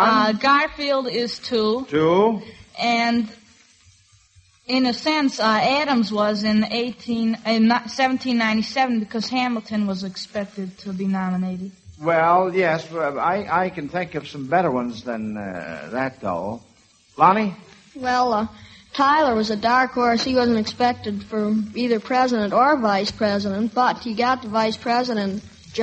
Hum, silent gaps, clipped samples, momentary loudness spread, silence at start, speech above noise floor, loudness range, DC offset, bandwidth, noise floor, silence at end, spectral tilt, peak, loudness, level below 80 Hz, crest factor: none; none; under 0.1%; 12 LU; 0 s; 35 dB; 4 LU; under 0.1%; 8.4 kHz; -55 dBFS; 0 s; -5.5 dB/octave; -2 dBFS; -21 LUFS; -56 dBFS; 20 dB